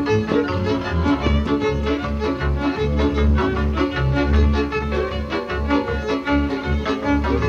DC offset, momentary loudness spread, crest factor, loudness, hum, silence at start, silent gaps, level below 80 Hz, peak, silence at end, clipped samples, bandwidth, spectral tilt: under 0.1%; 5 LU; 14 dB; -21 LUFS; none; 0 s; none; -24 dBFS; -6 dBFS; 0 s; under 0.1%; 7 kHz; -7.5 dB/octave